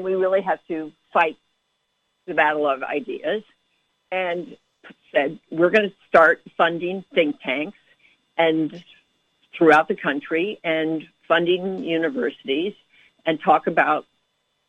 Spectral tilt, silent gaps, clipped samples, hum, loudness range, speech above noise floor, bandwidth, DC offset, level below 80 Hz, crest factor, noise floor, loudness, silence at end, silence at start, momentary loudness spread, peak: -6.5 dB/octave; none; under 0.1%; none; 5 LU; 51 dB; 10 kHz; under 0.1%; -68 dBFS; 20 dB; -72 dBFS; -21 LUFS; 0.65 s; 0 s; 12 LU; -4 dBFS